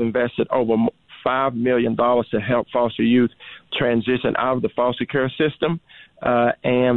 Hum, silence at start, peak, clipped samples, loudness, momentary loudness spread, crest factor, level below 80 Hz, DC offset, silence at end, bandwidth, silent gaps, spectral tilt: none; 0 s; -8 dBFS; under 0.1%; -21 LUFS; 6 LU; 12 dB; -54 dBFS; 0.1%; 0 s; 4.1 kHz; none; -9.5 dB/octave